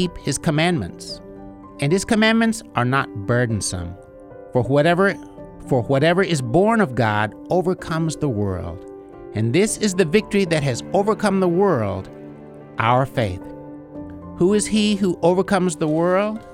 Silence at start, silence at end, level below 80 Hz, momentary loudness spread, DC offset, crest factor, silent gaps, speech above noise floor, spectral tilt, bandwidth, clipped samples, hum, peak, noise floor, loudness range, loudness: 0 s; 0 s; -46 dBFS; 19 LU; under 0.1%; 18 dB; none; 21 dB; -5.5 dB/octave; 14.5 kHz; under 0.1%; none; -2 dBFS; -40 dBFS; 3 LU; -20 LUFS